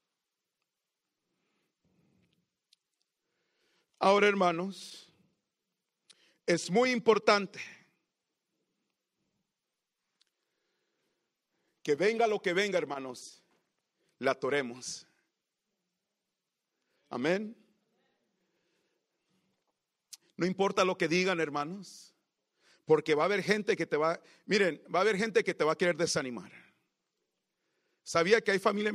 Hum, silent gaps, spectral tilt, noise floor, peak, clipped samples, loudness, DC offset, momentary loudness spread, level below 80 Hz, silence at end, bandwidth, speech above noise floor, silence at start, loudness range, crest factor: none; none; -4.5 dB/octave; -87 dBFS; -10 dBFS; under 0.1%; -29 LUFS; under 0.1%; 18 LU; -80 dBFS; 0 s; 13 kHz; 58 dB; 4 s; 10 LU; 24 dB